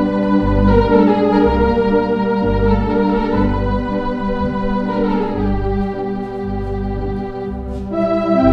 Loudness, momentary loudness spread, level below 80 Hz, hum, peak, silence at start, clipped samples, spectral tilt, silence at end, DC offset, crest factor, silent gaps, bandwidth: -17 LUFS; 10 LU; -26 dBFS; none; 0 dBFS; 0 s; under 0.1%; -9.5 dB/octave; 0 s; under 0.1%; 16 dB; none; 6 kHz